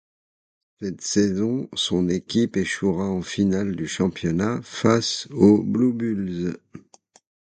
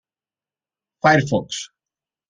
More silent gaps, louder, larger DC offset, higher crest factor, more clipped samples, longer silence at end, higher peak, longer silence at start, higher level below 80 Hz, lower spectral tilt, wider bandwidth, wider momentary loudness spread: neither; second, -22 LUFS vs -18 LUFS; neither; about the same, 20 dB vs 22 dB; neither; about the same, 0.75 s vs 0.65 s; about the same, -4 dBFS vs -2 dBFS; second, 0.8 s vs 1.05 s; first, -50 dBFS vs -58 dBFS; about the same, -5.5 dB/octave vs -5 dB/octave; about the same, 9.4 kHz vs 10 kHz; second, 9 LU vs 15 LU